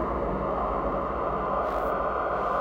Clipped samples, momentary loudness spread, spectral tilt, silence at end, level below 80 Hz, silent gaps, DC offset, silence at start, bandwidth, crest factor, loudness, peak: under 0.1%; 1 LU; -8 dB/octave; 0 s; -40 dBFS; none; under 0.1%; 0 s; 16 kHz; 14 dB; -28 LUFS; -14 dBFS